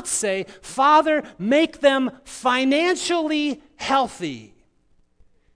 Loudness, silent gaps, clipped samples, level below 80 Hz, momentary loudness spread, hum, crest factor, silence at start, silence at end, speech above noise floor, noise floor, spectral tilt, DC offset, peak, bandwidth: -21 LUFS; none; under 0.1%; -58 dBFS; 13 LU; none; 18 dB; 0 s; 1.1 s; 40 dB; -60 dBFS; -3 dB/octave; under 0.1%; -4 dBFS; 11 kHz